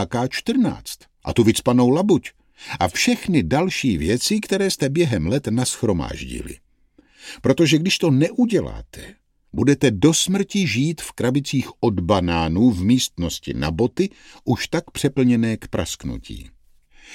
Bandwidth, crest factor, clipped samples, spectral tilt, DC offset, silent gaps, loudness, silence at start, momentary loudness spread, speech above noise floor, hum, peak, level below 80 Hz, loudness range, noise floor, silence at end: 16.5 kHz; 18 dB; under 0.1%; -5 dB/octave; under 0.1%; none; -20 LUFS; 0 s; 16 LU; 37 dB; none; -2 dBFS; -42 dBFS; 3 LU; -57 dBFS; 0 s